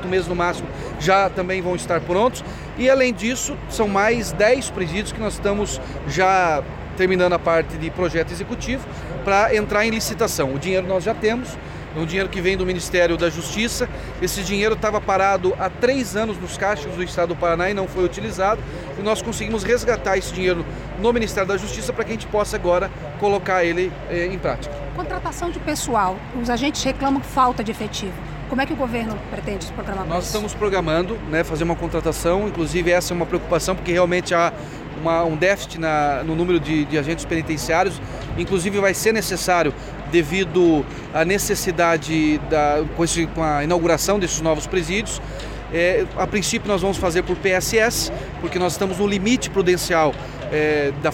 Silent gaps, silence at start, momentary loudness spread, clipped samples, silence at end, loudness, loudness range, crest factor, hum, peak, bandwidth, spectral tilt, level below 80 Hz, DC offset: none; 0 s; 9 LU; under 0.1%; 0 s; -21 LUFS; 3 LU; 16 dB; none; -4 dBFS; 17 kHz; -4.5 dB/octave; -36 dBFS; under 0.1%